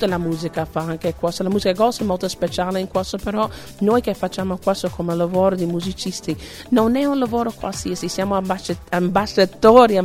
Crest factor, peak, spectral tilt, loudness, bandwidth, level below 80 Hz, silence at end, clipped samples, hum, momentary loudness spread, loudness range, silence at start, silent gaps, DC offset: 20 dB; 0 dBFS; -5.5 dB/octave; -20 LUFS; 16 kHz; -44 dBFS; 0 s; under 0.1%; none; 8 LU; 2 LU; 0 s; none; under 0.1%